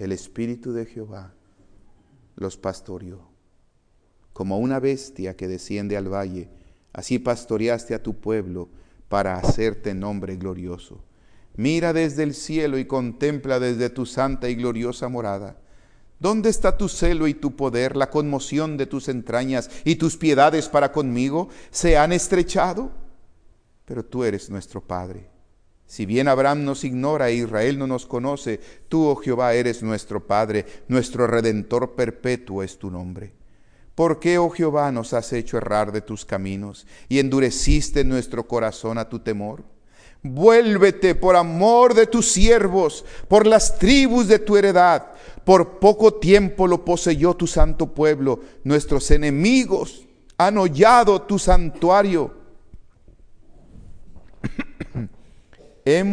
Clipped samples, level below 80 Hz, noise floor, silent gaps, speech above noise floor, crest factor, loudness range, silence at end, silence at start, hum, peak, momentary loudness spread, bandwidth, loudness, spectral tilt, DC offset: under 0.1%; -32 dBFS; -60 dBFS; none; 41 dB; 20 dB; 12 LU; 0 s; 0 s; none; 0 dBFS; 17 LU; 10.5 kHz; -20 LUFS; -5 dB/octave; under 0.1%